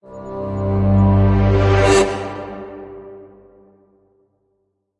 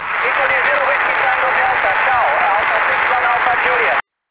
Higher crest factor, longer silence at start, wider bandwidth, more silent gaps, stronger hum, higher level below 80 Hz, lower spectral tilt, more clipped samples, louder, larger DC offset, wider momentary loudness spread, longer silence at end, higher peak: first, 18 dB vs 12 dB; about the same, 0.1 s vs 0 s; first, 11 kHz vs 4 kHz; neither; first, 50 Hz at -40 dBFS vs none; first, -30 dBFS vs -50 dBFS; about the same, -6.5 dB/octave vs -5.5 dB/octave; neither; about the same, -16 LUFS vs -14 LUFS; second, under 0.1% vs 0.1%; first, 22 LU vs 1 LU; first, 1.75 s vs 0.3 s; about the same, -2 dBFS vs -2 dBFS